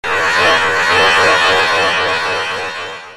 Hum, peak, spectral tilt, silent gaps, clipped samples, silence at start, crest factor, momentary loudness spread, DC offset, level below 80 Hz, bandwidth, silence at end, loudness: none; 0 dBFS; -1.5 dB/octave; none; under 0.1%; 0.05 s; 14 dB; 10 LU; under 0.1%; -46 dBFS; 14 kHz; 0 s; -12 LUFS